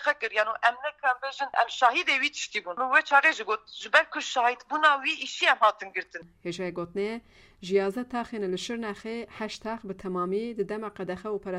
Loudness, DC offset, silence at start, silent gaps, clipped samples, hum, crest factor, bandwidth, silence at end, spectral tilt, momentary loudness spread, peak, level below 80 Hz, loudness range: -27 LUFS; under 0.1%; 0 s; none; under 0.1%; none; 22 dB; 13.5 kHz; 0 s; -3 dB/octave; 14 LU; -6 dBFS; -66 dBFS; 8 LU